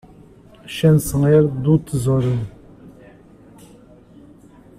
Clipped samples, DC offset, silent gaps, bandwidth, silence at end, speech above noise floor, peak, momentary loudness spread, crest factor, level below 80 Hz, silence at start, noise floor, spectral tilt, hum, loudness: under 0.1%; under 0.1%; none; 15 kHz; 1.9 s; 30 dB; -4 dBFS; 11 LU; 16 dB; -44 dBFS; 0.65 s; -46 dBFS; -7.5 dB/octave; none; -17 LUFS